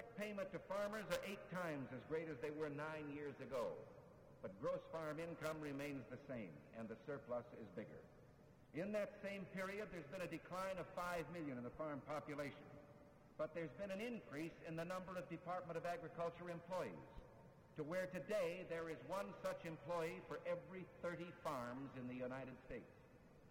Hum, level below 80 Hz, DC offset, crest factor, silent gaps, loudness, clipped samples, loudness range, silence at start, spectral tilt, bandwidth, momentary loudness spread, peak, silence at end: none; -74 dBFS; under 0.1%; 22 dB; none; -49 LUFS; under 0.1%; 3 LU; 0 s; -6 dB/octave; over 20 kHz; 12 LU; -26 dBFS; 0 s